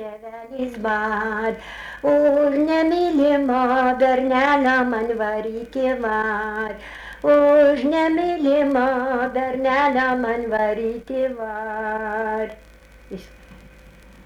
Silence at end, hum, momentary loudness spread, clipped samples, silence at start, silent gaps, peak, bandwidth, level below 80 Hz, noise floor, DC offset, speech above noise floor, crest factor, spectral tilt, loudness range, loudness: 0.35 s; none; 13 LU; under 0.1%; 0 s; none; -6 dBFS; 10.5 kHz; -50 dBFS; -46 dBFS; under 0.1%; 26 dB; 14 dB; -6 dB/octave; 7 LU; -20 LUFS